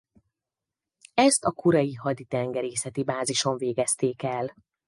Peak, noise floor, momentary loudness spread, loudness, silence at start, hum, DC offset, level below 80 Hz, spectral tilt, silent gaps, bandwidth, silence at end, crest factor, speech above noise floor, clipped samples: -8 dBFS; -89 dBFS; 9 LU; -26 LUFS; 1.15 s; none; under 0.1%; -66 dBFS; -4 dB/octave; none; 11.5 kHz; 0.35 s; 20 dB; 63 dB; under 0.1%